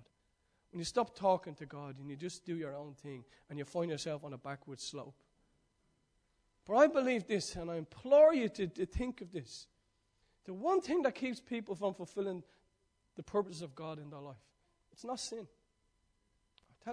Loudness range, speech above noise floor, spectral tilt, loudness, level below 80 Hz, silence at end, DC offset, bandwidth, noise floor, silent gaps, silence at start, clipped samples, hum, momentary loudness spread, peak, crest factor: 12 LU; 42 dB; -5 dB/octave; -35 LUFS; -60 dBFS; 0 s; under 0.1%; 10.5 kHz; -78 dBFS; none; 0.75 s; under 0.1%; none; 21 LU; -14 dBFS; 24 dB